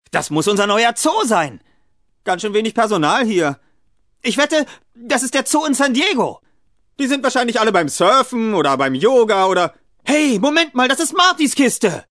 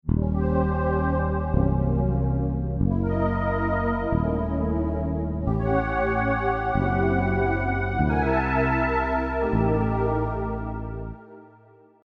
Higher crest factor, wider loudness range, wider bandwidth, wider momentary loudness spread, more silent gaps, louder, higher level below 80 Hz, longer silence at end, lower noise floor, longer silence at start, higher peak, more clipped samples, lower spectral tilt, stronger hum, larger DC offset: about the same, 16 dB vs 16 dB; about the same, 4 LU vs 2 LU; first, 11 kHz vs 5.6 kHz; first, 8 LU vs 5 LU; neither; first, -16 LUFS vs -24 LUFS; second, -62 dBFS vs -32 dBFS; second, 0.1 s vs 0.6 s; first, -64 dBFS vs -54 dBFS; about the same, 0.15 s vs 0.05 s; first, 0 dBFS vs -8 dBFS; neither; second, -3 dB/octave vs -10.5 dB/octave; neither; first, 0.2% vs under 0.1%